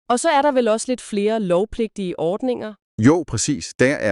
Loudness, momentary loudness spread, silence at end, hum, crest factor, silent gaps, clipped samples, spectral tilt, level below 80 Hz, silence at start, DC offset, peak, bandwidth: -20 LUFS; 8 LU; 0 s; none; 16 dB; 2.82-2.98 s, 3.75-3.79 s; under 0.1%; -5 dB/octave; -48 dBFS; 0.1 s; under 0.1%; -4 dBFS; 12 kHz